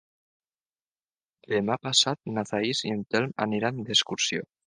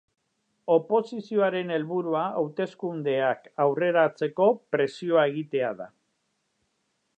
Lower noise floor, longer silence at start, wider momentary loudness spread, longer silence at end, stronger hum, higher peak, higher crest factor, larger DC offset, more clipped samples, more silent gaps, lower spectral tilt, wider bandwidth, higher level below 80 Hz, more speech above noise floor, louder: first, under -90 dBFS vs -75 dBFS; first, 1.5 s vs 0.65 s; about the same, 7 LU vs 8 LU; second, 0.25 s vs 1.3 s; neither; about the same, -8 dBFS vs -8 dBFS; about the same, 22 dB vs 18 dB; neither; neither; neither; second, -3 dB/octave vs -7 dB/octave; first, 10 kHz vs 8.6 kHz; first, -68 dBFS vs -82 dBFS; first, over 63 dB vs 50 dB; about the same, -26 LUFS vs -26 LUFS